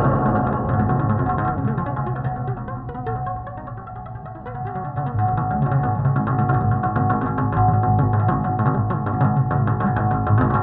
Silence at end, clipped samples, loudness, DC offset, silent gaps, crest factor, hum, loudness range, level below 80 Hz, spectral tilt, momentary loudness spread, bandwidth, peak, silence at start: 0 s; under 0.1%; -21 LUFS; under 0.1%; none; 14 dB; none; 8 LU; -36 dBFS; -13.5 dB/octave; 12 LU; 3.9 kHz; -6 dBFS; 0 s